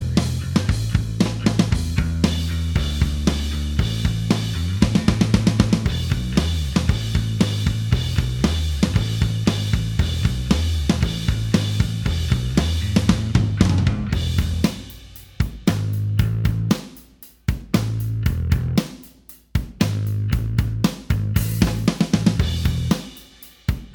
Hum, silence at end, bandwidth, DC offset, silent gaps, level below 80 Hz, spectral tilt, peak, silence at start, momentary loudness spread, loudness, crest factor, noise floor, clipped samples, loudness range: none; 0 s; 20 kHz; under 0.1%; none; -28 dBFS; -6 dB/octave; 0 dBFS; 0 s; 6 LU; -21 LUFS; 20 dB; -47 dBFS; under 0.1%; 3 LU